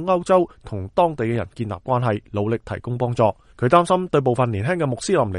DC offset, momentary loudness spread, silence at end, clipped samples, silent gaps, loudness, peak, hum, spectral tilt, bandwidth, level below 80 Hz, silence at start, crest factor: under 0.1%; 9 LU; 0 s; under 0.1%; none; -21 LUFS; 0 dBFS; none; -7 dB/octave; 11 kHz; -50 dBFS; 0 s; 20 dB